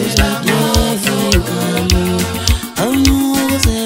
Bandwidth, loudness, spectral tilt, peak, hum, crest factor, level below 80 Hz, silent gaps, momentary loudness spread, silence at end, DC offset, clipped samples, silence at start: 16.5 kHz; -14 LUFS; -4.5 dB/octave; 0 dBFS; none; 14 dB; -22 dBFS; none; 4 LU; 0 s; under 0.1%; under 0.1%; 0 s